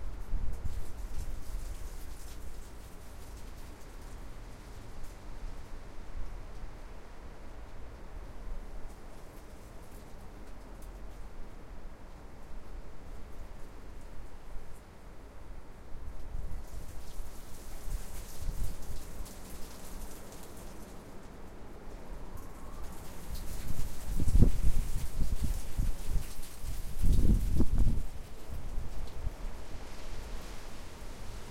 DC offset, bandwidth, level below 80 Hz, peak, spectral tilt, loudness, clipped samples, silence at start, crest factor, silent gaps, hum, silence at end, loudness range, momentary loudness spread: under 0.1%; 15.5 kHz; -36 dBFS; -6 dBFS; -6 dB/octave; -42 LUFS; under 0.1%; 0 s; 24 dB; none; none; 0 s; 16 LU; 16 LU